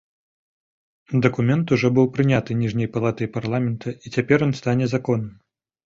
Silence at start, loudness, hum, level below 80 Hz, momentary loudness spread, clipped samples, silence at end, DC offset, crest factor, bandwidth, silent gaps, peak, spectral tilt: 1.1 s; -21 LUFS; none; -54 dBFS; 8 LU; under 0.1%; 0.55 s; under 0.1%; 20 dB; 7.6 kHz; none; -2 dBFS; -7.5 dB/octave